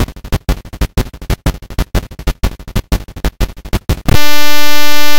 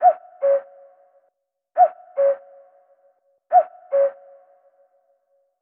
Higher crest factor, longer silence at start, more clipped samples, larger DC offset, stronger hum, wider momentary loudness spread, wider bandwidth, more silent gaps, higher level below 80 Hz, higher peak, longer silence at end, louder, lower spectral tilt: second, 6 dB vs 18 dB; about the same, 0 s vs 0 s; first, 10% vs under 0.1%; neither; neither; first, 8 LU vs 5 LU; first, over 20 kHz vs 2.9 kHz; neither; first, -18 dBFS vs under -90 dBFS; first, 0 dBFS vs -4 dBFS; second, 0 s vs 1.5 s; first, -17 LUFS vs -21 LUFS; first, -4 dB/octave vs -1 dB/octave